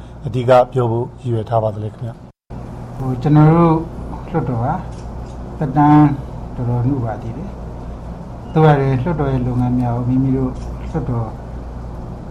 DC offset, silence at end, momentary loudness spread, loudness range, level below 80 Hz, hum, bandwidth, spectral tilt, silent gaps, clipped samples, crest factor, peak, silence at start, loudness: under 0.1%; 0 s; 19 LU; 3 LU; -32 dBFS; none; 7.8 kHz; -9.5 dB/octave; none; under 0.1%; 16 dB; -2 dBFS; 0 s; -17 LUFS